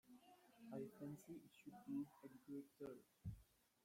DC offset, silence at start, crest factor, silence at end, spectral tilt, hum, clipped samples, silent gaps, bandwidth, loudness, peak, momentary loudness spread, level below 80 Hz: under 0.1%; 0.05 s; 16 dB; 0.4 s; -7.5 dB/octave; none; under 0.1%; none; 16.5 kHz; -57 LUFS; -40 dBFS; 14 LU; -76 dBFS